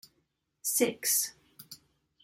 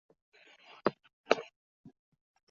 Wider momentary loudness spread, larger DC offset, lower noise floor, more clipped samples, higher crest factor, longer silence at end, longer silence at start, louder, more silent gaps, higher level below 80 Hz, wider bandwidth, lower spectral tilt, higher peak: about the same, 22 LU vs 21 LU; neither; first, -77 dBFS vs -59 dBFS; neither; second, 22 dB vs 32 dB; second, 0.5 s vs 1.05 s; second, 0.65 s vs 0.85 s; first, -29 LUFS vs -34 LUFS; second, none vs 1.13-1.24 s; about the same, -78 dBFS vs -78 dBFS; first, 16.5 kHz vs 7.4 kHz; second, -1 dB/octave vs -2.5 dB/octave; second, -12 dBFS vs -8 dBFS